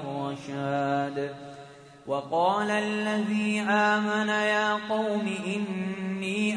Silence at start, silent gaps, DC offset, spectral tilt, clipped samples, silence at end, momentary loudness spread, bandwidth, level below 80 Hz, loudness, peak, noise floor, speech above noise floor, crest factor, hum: 0 s; none; under 0.1%; -5 dB/octave; under 0.1%; 0 s; 10 LU; 10.5 kHz; -70 dBFS; -27 LUFS; -10 dBFS; -48 dBFS; 21 dB; 18 dB; none